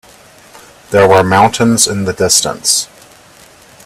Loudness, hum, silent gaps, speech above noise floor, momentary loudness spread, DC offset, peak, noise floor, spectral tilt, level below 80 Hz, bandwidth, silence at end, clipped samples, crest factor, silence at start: -10 LUFS; none; none; 31 dB; 7 LU; under 0.1%; 0 dBFS; -41 dBFS; -3 dB/octave; -46 dBFS; over 20 kHz; 1 s; under 0.1%; 14 dB; 0.9 s